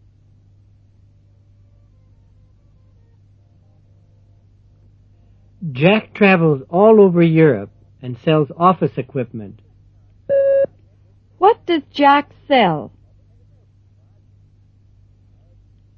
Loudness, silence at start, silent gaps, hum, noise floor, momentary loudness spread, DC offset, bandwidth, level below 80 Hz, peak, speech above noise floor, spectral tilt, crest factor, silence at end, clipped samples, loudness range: -15 LUFS; 5.6 s; none; none; -51 dBFS; 18 LU; under 0.1%; 5.8 kHz; -54 dBFS; 0 dBFS; 37 dB; -9.5 dB/octave; 18 dB; 3.1 s; under 0.1%; 9 LU